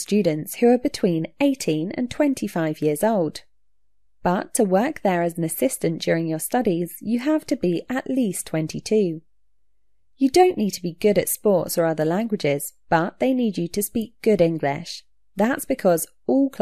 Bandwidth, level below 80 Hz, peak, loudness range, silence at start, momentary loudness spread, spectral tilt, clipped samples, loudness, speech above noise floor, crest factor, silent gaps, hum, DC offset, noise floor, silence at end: 14 kHz; -58 dBFS; -4 dBFS; 3 LU; 0 s; 7 LU; -5.5 dB/octave; under 0.1%; -22 LUFS; 53 dB; 18 dB; none; none; 0.3%; -74 dBFS; 0.05 s